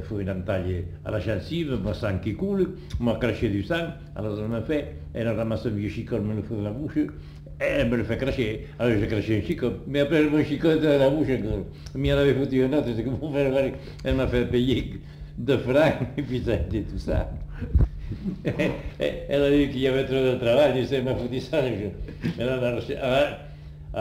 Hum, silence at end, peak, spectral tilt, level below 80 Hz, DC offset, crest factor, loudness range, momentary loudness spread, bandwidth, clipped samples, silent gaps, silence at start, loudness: none; 0 s; -10 dBFS; -7.5 dB/octave; -38 dBFS; under 0.1%; 16 dB; 5 LU; 11 LU; 16 kHz; under 0.1%; none; 0 s; -25 LUFS